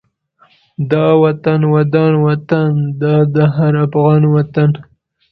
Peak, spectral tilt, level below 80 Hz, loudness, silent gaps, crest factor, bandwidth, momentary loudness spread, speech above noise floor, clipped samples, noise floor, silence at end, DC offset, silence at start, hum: 0 dBFS; -11 dB/octave; -48 dBFS; -13 LUFS; none; 12 dB; 4.7 kHz; 5 LU; 41 dB; under 0.1%; -53 dBFS; 0.5 s; under 0.1%; 0.8 s; none